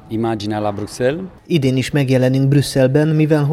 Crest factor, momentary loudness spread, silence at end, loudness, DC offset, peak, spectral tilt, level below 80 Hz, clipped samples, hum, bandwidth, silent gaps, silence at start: 14 dB; 7 LU; 0 s; -16 LUFS; under 0.1%; -2 dBFS; -7 dB/octave; -46 dBFS; under 0.1%; none; 14 kHz; none; 0.1 s